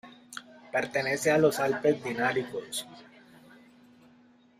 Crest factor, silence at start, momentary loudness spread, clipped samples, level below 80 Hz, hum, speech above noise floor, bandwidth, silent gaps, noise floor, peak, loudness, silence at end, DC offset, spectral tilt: 20 dB; 0.05 s; 20 LU; under 0.1%; -70 dBFS; none; 32 dB; 15.5 kHz; none; -60 dBFS; -10 dBFS; -28 LUFS; 1.55 s; under 0.1%; -4.5 dB/octave